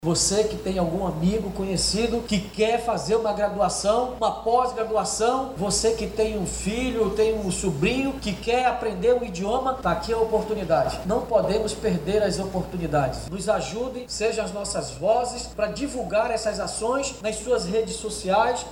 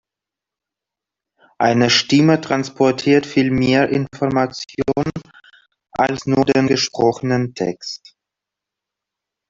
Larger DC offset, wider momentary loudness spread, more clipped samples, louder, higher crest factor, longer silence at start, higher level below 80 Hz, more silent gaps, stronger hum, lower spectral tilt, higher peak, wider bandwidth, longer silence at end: neither; second, 6 LU vs 10 LU; neither; second, -24 LUFS vs -17 LUFS; about the same, 16 dB vs 18 dB; second, 0 s vs 1.6 s; first, -42 dBFS vs -50 dBFS; neither; neither; about the same, -4 dB/octave vs -5 dB/octave; second, -8 dBFS vs 0 dBFS; first, 16.5 kHz vs 7.8 kHz; second, 0 s vs 1.55 s